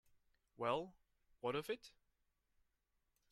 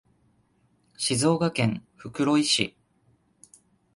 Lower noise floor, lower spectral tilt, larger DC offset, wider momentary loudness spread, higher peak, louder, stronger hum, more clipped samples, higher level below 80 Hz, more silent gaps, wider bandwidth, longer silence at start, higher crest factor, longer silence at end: first, -85 dBFS vs -66 dBFS; about the same, -5 dB/octave vs -4 dB/octave; neither; about the same, 12 LU vs 10 LU; second, -26 dBFS vs -8 dBFS; second, -44 LUFS vs -25 LUFS; neither; neither; second, -78 dBFS vs -62 dBFS; neither; first, 15 kHz vs 11.5 kHz; second, 0.6 s vs 1 s; about the same, 24 dB vs 22 dB; first, 1.4 s vs 1.25 s